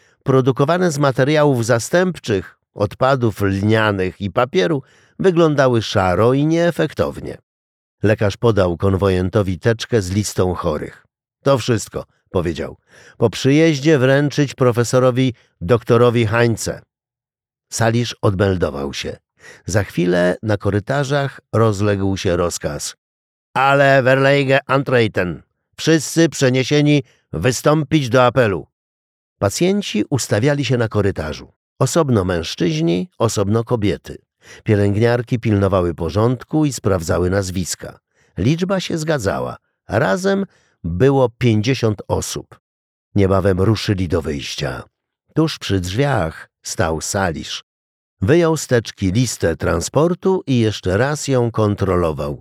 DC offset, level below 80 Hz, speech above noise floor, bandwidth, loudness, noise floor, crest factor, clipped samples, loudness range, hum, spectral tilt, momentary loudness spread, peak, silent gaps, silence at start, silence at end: under 0.1%; -44 dBFS; over 73 dB; 15.5 kHz; -17 LUFS; under -90 dBFS; 16 dB; under 0.1%; 4 LU; none; -5.5 dB/octave; 10 LU; -2 dBFS; 7.43-7.98 s, 22.98-23.54 s, 28.73-29.36 s, 31.56-31.76 s, 42.60-43.11 s, 47.63-48.17 s; 0.25 s; 0.05 s